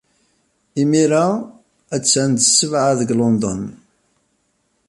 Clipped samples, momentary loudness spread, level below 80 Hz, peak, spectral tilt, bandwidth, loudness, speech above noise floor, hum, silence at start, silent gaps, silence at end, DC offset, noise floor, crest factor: under 0.1%; 15 LU; -54 dBFS; 0 dBFS; -4 dB/octave; 11.5 kHz; -16 LUFS; 50 dB; none; 0.75 s; none; 1.15 s; under 0.1%; -66 dBFS; 18 dB